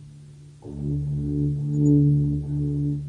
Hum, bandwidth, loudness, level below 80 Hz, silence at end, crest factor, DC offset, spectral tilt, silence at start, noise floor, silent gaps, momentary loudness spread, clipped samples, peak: none; 7.4 kHz; -23 LUFS; -42 dBFS; 0 s; 14 dB; under 0.1%; -11 dB/octave; 0 s; -45 dBFS; none; 13 LU; under 0.1%; -10 dBFS